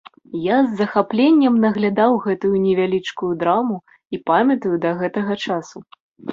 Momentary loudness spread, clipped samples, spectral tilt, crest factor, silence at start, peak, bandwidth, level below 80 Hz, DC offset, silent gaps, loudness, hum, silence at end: 12 LU; under 0.1%; -7 dB/octave; 16 dB; 0.35 s; -2 dBFS; 7.4 kHz; -60 dBFS; under 0.1%; 6.00-6.12 s; -18 LUFS; none; 0 s